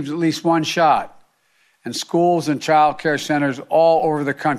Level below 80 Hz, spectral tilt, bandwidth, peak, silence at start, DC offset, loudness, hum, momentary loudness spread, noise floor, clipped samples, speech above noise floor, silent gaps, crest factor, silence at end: -60 dBFS; -5 dB/octave; 14.5 kHz; -4 dBFS; 0 s; under 0.1%; -18 LUFS; none; 8 LU; -61 dBFS; under 0.1%; 44 dB; none; 14 dB; 0 s